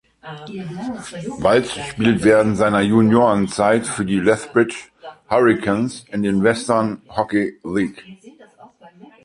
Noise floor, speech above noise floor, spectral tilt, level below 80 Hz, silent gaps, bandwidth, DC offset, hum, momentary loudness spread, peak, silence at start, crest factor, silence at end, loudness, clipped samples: -46 dBFS; 28 dB; -6 dB/octave; -50 dBFS; none; 11.5 kHz; under 0.1%; none; 15 LU; -2 dBFS; 0.25 s; 18 dB; 0.35 s; -18 LUFS; under 0.1%